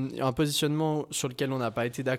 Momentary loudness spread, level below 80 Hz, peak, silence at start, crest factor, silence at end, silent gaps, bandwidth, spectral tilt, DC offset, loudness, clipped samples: 4 LU; -58 dBFS; -14 dBFS; 0 s; 16 dB; 0 s; none; 16.5 kHz; -4.5 dB/octave; under 0.1%; -29 LUFS; under 0.1%